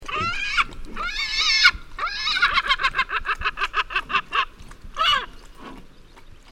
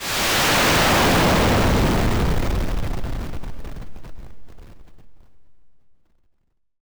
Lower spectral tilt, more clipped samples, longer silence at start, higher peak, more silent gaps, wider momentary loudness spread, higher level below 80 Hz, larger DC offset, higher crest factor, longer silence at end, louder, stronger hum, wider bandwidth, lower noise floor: second, -0.5 dB/octave vs -4 dB/octave; neither; about the same, 0 s vs 0 s; first, 0 dBFS vs -10 dBFS; neither; second, 13 LU vs 21 LU; second, -40 dBFS vs -28 dBFS; neither; first, 24 dB vs 12 dB; second, 0 s vs 1.1 s; second, -21 LUFS vs -18 LUFS; neither; second, 16 kHz vs over 20 kHz; second, -45 dBFS vs -65 dBFS